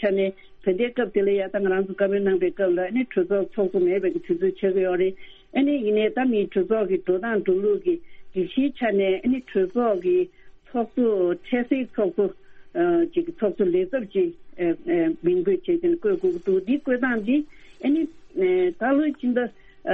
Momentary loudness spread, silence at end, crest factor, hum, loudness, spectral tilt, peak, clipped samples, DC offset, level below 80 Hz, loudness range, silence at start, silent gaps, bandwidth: 5 LU; 0 s; 14 dB; none; -24 LUFS; -9 dB/octave; -8 dBFS; under 0.1%; under 0.1%; -56 dBFS; 1 LU; 0 s; none; 4 kHz